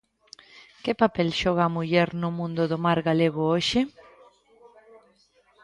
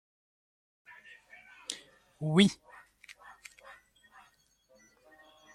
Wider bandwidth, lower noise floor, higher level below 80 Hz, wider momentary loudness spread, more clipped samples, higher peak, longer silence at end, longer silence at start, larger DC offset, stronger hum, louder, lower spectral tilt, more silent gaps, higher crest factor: second, 11 kHz vs 12.5 kHz; second, -63 dBFS vs -67 dBFS; first, -56 dBFS vs -74 dBFS; second, 6 LU vs 29 LU; neither; first, -6 dBFS vs -10 dBFS; second, 1.75 s vs 3 s; second, 0.55 s vs 1.7 s; neither; neither; first, -24 LUFS vs -30 LUFS; about the same, -6 dB/octave vs -5 dB/octave; neither; second, 20 dB vs 26 dB